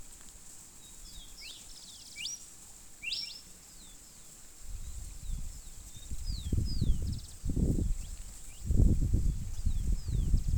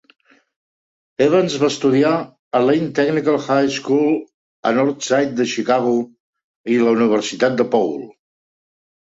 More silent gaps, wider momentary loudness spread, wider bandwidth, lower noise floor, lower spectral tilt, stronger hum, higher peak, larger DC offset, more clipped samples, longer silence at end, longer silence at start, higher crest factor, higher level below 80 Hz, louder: second, none vs 2.39-2.51 s, 4.34-4.63 s, 6.20-6.33 s, 6.44-6.64 s; first, 18 LU vs 8 LU; first, 20 kHz vs 8 kHz; second, -52 dBFS vs under -90 dBFS; about the same, -5 dB/octave vs -5 dB/octave; neither; second, -12 dBFS vs -2 dBFS; neither; neither; second, 0 s vs 1.05 s; second, 0 s vs 1.2 s; about the same, 20 dB vs 16 dB; first, -36 dBFS vs -64 dBFS; second, -36 LUFS vs -18 LUFS